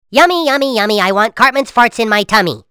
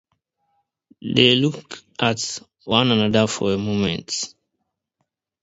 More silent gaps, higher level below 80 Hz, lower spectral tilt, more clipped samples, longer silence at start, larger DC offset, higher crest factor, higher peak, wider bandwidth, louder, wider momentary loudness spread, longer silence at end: neither; about the same, -48 dBFS vs -52 dBFS; about the same, -3.5 dB/octave vs -4 dB/octave; first, 0.3% vs under 0.1%; second, 0.1 s vs 1.05 s; neither; second, 12 dB vs 22 dB; about the same, 0 dBFS vs 0 dBFS; first, over 20 kHz vs 8 kHz; first, -11 LUFS vs -20 LUFS; second, 3 LU vs 17 LU; second, 0.1 s vs 1.15 s